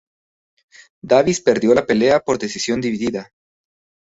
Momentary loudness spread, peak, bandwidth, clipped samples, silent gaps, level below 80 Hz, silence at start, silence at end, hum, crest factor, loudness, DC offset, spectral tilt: 8 LU; -2 dBFS; 8 kHz; under 0.1%; none; -54 dBFS; 1.05 s; 0.8 s; none; 18 dB; -17 LUFS; under 0.1%; -4.5 dB/octave